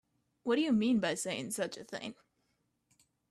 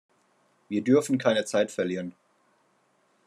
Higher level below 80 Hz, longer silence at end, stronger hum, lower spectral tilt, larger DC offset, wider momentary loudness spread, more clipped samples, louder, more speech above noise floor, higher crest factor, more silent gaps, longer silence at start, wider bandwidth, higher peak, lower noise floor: first, -74 dBFS vs -80 dBFS; about the same, 1.2 s vs 1.15 s; neither; about the same, -4 dB/octave vs -5 dB/octave; neither; first, 14 LU vs 11 LU; neither; second, -34 LUFS vs -26 LUFS; about the same, 46 dB vs 43 dB; about the same, 16 dB vs 20 dB; neither; second, 0.45 s vs 0.7 s; about the same, 13.5 kHz vs 13 kHz; second, -18 dBFS vs -8 dBFS; first, -79 dBFS vs -68 dBFS